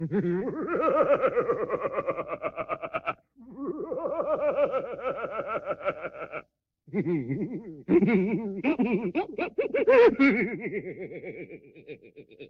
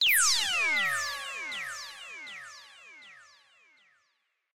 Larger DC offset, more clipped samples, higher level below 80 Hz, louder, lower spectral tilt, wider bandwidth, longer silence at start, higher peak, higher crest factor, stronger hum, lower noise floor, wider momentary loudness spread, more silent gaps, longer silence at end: neither; neither; first, -62 dBFS vs -72 dBFS; about the same, -27 LUFS vs -27 LUFS; first, -9 dB/octave vs 2.5 dB/octave; second, 6.4 kHz vs 16 kHz; about the same, 0 s vs 0 s; first, -8 dBFS vs -14 dBFS; about the same, 18 dB vs 18 dB; neither; second, -59 dBFS vs -77 dBFS; second, 17 LU vs 26 LU; neither; second, 0 s vs 1.3 s